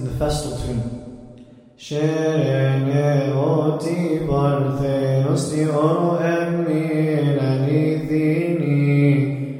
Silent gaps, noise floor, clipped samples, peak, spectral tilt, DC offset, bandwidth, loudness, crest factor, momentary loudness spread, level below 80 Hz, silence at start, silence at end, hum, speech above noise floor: none; -44 dBFS; under 0.1%; -4 dBFS; -7.5 dB/octave; under 0.1%; 12 kHz; -20 LUFS; 16 dB; 7 LU; -42 dBFS; 0 s; 0 s; none; 25 dB